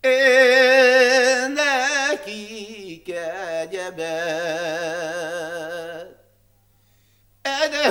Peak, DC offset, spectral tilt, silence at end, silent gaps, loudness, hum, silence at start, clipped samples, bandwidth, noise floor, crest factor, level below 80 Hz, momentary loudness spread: -2 dBFS; under 0.1%; -1.5 dB/octave; 0 s; none; -19 LUFS; 50 Hz at -65 dBFS; 0.05 s; under 0.1%; 16.5 kHz; -60 dBFS; 18 dB; -64 dBFS; 20 LU